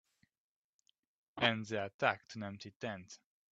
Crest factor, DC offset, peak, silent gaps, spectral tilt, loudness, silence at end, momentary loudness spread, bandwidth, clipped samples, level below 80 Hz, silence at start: 26 dB; under 0.1%; -14 dBFS; 1.94-1.99 s, 2.76-2.80 s; -4.5 dB/octave; -37 LUFS; 0.35 s; 21 LU; 8 kHz; under 0.1%; -80 dBFS; 1.35 s